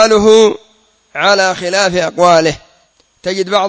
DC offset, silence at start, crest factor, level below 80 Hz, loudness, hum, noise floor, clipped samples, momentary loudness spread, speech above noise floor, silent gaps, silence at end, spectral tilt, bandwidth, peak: under 0.1%; 0 s; 12 dB; -46 dBFS; -11 LUFS; none; -53 dBFS; 0.3%; 18 LU; 43 dB; none; 0 s; -3.5 dB/octave; 8 kHz; 0 dBFS